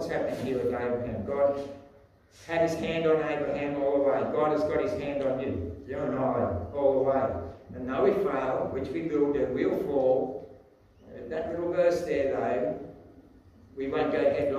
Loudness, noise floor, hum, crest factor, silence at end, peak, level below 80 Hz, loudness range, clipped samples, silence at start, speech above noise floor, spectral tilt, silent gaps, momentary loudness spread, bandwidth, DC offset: -28 LUFS; -57 dBFS; none; 16 dB; 0 s; -12 dBFS; -54 dBFS; 2 LU; under 0.1%; 0 s; 29 dB; -7 dB/octave; none; 11 LU; 13 kHz; under 0.1%